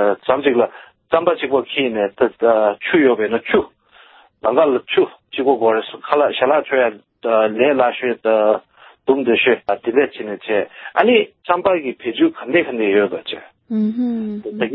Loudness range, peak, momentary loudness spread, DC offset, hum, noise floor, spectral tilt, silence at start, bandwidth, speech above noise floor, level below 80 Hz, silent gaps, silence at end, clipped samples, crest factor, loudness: 1 LU; 0 dBFS; 8 LU; under 0.1%; none; -48 dBFS; -9.5 dB/octave; 0 s; 4.3 kHz; 31 dB; -60 dBFS; none; 0 s; under 0.1%; 18 dB; -17 LUFS